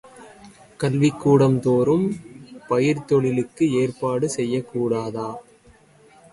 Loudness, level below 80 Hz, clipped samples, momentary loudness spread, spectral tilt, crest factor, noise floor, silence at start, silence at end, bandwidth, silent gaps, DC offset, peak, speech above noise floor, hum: -21 LUFS; -58 dBFS; under 0.1%; 12 LU; -7 dB/octave; 18 dB; -53 dBFS; 0.05 s; 0.9 s; 11.5 kHz; none; under 0.1%; -4 dBFS; 32 dB; none